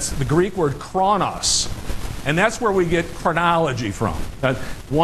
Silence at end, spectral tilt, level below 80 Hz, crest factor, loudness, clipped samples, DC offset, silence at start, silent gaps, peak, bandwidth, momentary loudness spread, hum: 0 s; -4 dB/octave; -34 dBFS; 16 dB; -20 LUFS; under 0.1%; under 0.1%; 0 s; none; -4 dBFS; 13 kHz; 8 LU; none